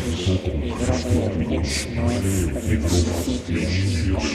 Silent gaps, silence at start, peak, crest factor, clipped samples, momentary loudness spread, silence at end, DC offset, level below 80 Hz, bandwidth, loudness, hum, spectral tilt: none; 0 s; -8 dBFS; 14 dB; under 0.1%; 3 LU; 0 s; under 0.1%; -30 dBFS; 14.5 kHz; -23 LUFS; none; -5.5 dB/octave